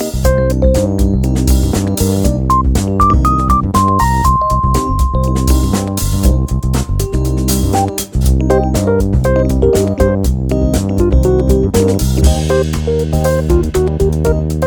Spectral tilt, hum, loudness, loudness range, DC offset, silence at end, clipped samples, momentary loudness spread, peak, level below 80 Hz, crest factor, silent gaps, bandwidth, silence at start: -6.5 dB/octave; none; -13 LUFS; 2 LU; under 0.1%; 0 s; under 0.1%; 4 LU; 0 dBFS; -16 dBFS; 12 dB; none; 19 kHz; 0 s